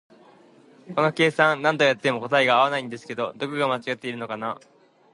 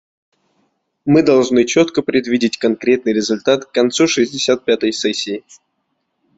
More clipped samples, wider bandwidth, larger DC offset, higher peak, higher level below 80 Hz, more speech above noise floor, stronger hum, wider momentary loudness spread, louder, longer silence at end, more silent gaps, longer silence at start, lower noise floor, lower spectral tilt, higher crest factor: neither; first, 11.5 kHz vs 8 kHz; neither; about the same, -4 dBFS vs -2 dBFS; second, -74 dBFS vs -56 dBFS; second, 30 dB vs 55 dB; neither; first, 12 LU vs 6 LU; second, -23 LUFS vs -15 LUFS; second, 0.6 s vs 1 s; neither; second, 0.85 s vs 1.05 s; second, -53 dBFS vs -70 dBFS; about the same, -5 dB/octave vs -4 dB/octave; first, 20 dB vs 14 dB